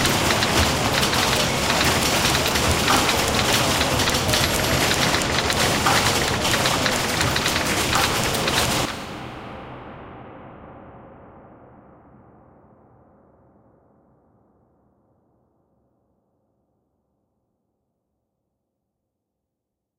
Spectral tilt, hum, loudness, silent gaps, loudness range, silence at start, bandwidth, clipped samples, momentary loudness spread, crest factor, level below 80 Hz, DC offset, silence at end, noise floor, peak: -3 dB/octave; none; -19 LUFS; none; 11 LU; 0 s; 17 kHz; under 0.1%; 18 LU; 18 dB; -38 dBFS; under 0.1%; 8.6 s; -82 dBFS; -4 dBFS